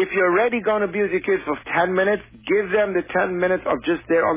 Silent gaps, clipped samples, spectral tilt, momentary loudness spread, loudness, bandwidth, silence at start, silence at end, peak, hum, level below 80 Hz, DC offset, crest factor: none; under 0.1%; -9.5 dB/octave; 5 LU; -21 LUFS; 3.8 kHz; 0 s; 0 s; -8 dBFS; none; -54 dBFS; under 0.1%; 12 dB